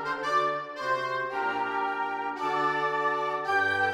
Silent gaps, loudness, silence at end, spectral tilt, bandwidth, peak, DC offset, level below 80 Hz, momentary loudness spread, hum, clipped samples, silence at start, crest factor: none; -28 LUFS; 0 s; -4 dB/octave; 16 kHz; -14 dBFS; under 0.1%; -74 dBFS; 5 LU; none; under 0.1%; 0 s; 14 dB